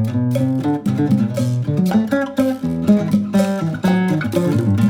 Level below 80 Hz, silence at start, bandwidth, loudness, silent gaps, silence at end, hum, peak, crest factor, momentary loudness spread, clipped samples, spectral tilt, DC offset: -50 dBFS; 0 s; 16.5 kHz; -18 LUFS; none; 0 s; none; -2 dBFS; 14 dB; 3 LU; under 0.1%; -8 dB/octave; under 0.1%